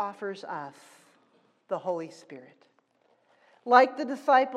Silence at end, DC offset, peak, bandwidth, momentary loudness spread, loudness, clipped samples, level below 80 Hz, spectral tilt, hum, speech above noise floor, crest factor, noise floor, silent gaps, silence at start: 0 s; under 0.1%; -6 dBFS; 10.5 kHz; 25 LU; -27 LUFS; under 0.1%; under -90 dBFS; -4.5 dB/octave; none; 41 dB; 24 dB; -68 dBFS; none; 0 s